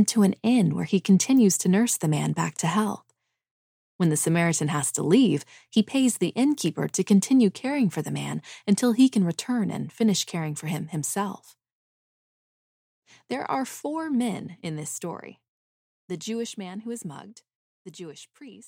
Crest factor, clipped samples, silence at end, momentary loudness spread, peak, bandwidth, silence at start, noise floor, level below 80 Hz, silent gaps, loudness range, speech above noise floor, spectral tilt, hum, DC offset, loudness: 18 dB; under 0.1%; 0.05 s; 15 LU; -8 dBFS; 16.5 kHz; 0 s; under -90 dBFS; -72 dBFS; 3.51-3.99 s, 11.72-13.02 s, 15.48-16.08 s, 17.55-17.85 s; 11 LU; over 66 dB; -5 dB/octave; none; under 0.1%; -24 LUFS